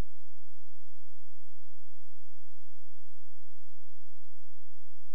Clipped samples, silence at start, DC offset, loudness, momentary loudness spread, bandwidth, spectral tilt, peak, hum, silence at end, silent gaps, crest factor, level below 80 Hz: under 0.1%; 0 s; 10%; -62 LUFS; 0 LU; 12 kHz; -6.5 dB/octave; -20 dBFS; none; 0 s; none; 12 dB; -78 dBFS